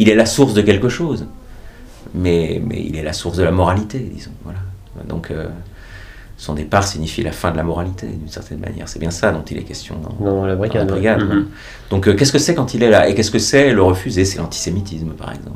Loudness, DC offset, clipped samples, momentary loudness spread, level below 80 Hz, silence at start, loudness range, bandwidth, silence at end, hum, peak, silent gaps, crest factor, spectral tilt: -17 LUFS; under 0.1%; under 0.1%; 18 LU; -36 dBFS; 0 s; 9 LU; 16 kHz; 0 s; none; 0 dBFS; none; 16 dB; -5 dB/octave